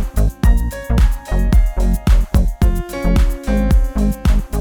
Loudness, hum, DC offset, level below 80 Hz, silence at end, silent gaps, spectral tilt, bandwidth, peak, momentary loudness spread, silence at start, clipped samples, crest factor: -17 LUFS; none; under 0.1%; -14 dBFS; 0 s; none; -7 dB/octave; 17 kHz; 0 dBFS; 4 LU; 0 s; under 0.1%; 14 dB